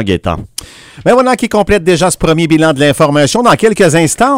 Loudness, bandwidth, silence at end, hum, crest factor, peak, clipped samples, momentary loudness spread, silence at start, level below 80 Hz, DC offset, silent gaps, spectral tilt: -10 LUFS; 16.5 kHz; 0 s; none; 10 dB; 0 dBFS; 0.8%; 8 LU; 0 s; -32 dBFS; under 0.1%; none; -5 dB/octave